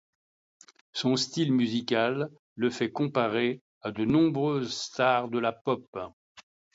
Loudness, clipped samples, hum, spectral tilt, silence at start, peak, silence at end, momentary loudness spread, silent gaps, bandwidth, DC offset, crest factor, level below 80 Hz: -28 LUFS; under 0.1%; none; -5.5 dB/octave; 0.95 s; -12 dBFS; 0.35 s; 12 LU; 2.39-2.56 s, 3.61-3.81 s, 5.61-5.65 s, 5.88-5.93 s, 6.13-6.35 s; 8 kHz; under 0.1%; 18 dB; -66 dBFS